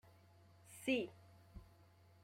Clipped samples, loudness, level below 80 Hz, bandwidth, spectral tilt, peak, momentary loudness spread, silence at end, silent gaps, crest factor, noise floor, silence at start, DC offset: under 0.1%; -42 LUFS; -70 dBFS; 16 kHz; -4.5 dB/octave; -26 dBFS; 25 LU; 0.6 s; none; 22 dB; -67 dBFS; 0.7 s; under 0.1%